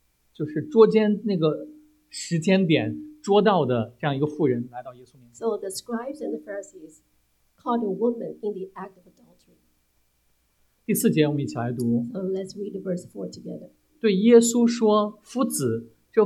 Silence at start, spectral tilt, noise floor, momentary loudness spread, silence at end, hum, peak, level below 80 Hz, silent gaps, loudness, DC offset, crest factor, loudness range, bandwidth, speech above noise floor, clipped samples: 0.4 s; -5.5 dB/octave; -67 dBFS; 19 LU; 0 s; none; -4 dBFS; -68 dBFS; none; -23 LUFS; under 0.1%; 20 dB; 9 LU; 15.5 kHz; 44 dB; under 0.1%